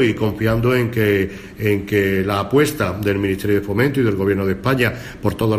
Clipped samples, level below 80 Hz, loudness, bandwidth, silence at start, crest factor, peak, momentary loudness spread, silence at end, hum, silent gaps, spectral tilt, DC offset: under 0.1%; -40 dBFS; -18 LUFS; 15.5 kHz; 0 s; 14 dB; -4 dBFS; 4 LU; 0 s; none; none; -6.5 dB/octave; under 0.1%